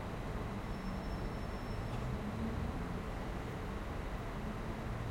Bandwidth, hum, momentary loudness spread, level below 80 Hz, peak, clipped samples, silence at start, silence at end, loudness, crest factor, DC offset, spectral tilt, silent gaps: 16.5 kHz; none; 3 LU; -46 dBFS; -26 dBFS; under 0.1%; 0 s; 0 s; -42 LUFS; 14 dB; under 0.1%; -7 dB/octave; none